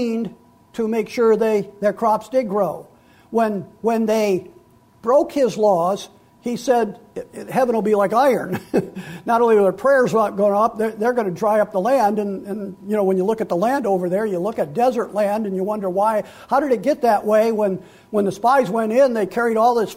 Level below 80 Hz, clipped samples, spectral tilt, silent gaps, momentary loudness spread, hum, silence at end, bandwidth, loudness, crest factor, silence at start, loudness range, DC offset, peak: -60 dBFS; under 0.1%; -6 dB/octave; none; 10 LU; none; 0 s; 16 kHz; -19 LUFS; 14 dB; 0 s; 3 LU; under 0.1%; -6 dBFS